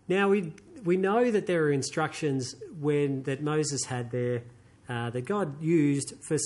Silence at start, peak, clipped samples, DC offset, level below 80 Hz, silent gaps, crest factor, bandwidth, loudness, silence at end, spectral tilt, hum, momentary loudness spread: 0.1 s; -12 dBFS; under 0.1%; under 0.1%; -66 dBFS; none; 16 dB; 11.5 kHz; -28 LUFS; 0 s; -5.5 dB/octave; none; 9 LU